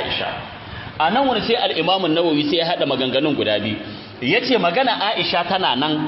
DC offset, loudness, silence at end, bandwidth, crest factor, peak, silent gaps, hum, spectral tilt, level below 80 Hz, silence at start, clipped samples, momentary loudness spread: under 0.1%; -19 LUFS; 0 s; 5.8 kHz; 14 dB; -4 dBFS; none; none; -8.5 dB/octave; -52 dBFS; 0 s; under 0.1%; 11 LU